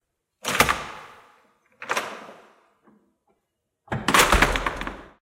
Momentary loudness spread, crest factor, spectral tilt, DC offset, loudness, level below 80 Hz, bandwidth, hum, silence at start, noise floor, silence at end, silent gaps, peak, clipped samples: 21 LU; 24 dB; -2.5 dB/octave; under 0.1%; -22 LUFS; -36 dBFS; 16 kHz; none; 0.45 s; -78 dBFS; 0.25 s; none; -4 dBFS; under 0.1%